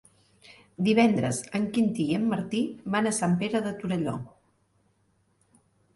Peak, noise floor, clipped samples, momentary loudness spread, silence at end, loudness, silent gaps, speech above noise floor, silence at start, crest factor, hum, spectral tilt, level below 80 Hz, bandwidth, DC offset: -10 dBFS; -69 dBFS; under 0.1%; 9 LU; 1.7 s; -27 LUFS; none; 43 dB; 0.5 s; 18 dB; none; -5.5 dB/octave; -64 dBFS; 11.5 kHz; under 0.1%